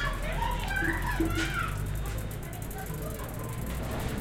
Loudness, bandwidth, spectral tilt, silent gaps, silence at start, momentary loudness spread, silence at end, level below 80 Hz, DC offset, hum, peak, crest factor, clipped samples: -33 LUFS; 17 kHz; -5 dB/octave; none; 0 s; 8 LU; 0 s; -36 dBFS; under 0.1%; none; -16 dBFS; 16 dB; under 0.1%